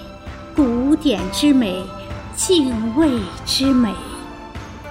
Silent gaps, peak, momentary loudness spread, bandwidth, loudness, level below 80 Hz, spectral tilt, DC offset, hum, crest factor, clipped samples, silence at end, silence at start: none; -4 dBFS; 18 LU; 16 kHz; -18 LUFS; -38 dBFS; -4.5 dB/octave; under 0.1%; none; 14 dB; under 0.1%; 0 s; 0 s